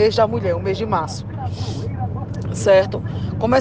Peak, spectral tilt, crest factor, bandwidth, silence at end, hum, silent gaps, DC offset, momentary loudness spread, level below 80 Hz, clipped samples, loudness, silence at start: -4 dBFS; -6.5 dB/octave; 16 dB; 9.6 kHz; 0 s; none; none; under 0.1%; 11 LU; -40 dBFS; under 0.1%; -21 LUFS; 0 s